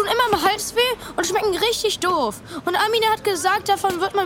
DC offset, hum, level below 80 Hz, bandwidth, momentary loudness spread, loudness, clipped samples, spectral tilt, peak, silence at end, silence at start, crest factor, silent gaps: under 0.1%; none; -50 dBFS; 17.5 kHz; 5 LU; -20 LUFS; under 0.1%; -2 dB/octave; -4 dBFS; 0 s; 0 s; 18 dB; none